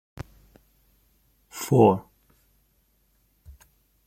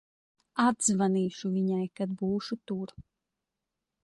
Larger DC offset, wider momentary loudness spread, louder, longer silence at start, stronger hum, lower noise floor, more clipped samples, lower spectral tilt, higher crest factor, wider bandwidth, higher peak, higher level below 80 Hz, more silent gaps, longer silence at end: neither; first, 25 LU vs 12 LU; first, -22 LUFS vs -30 LUFS; second, 0.2 s vs 0.55 s; neither; second, -67 dBFS vs -87 dBFS; neither; first, -7 dB/octave vs -5 dB/octave; first, 24 dB vs 18 dB; first, 16.5 kHz vs 11.5 kHz; first, -4 dBFS vs -12 dBFS; first, -56 dBFS vs -68 dBFS; neither; second, 0.55 s vs 1 s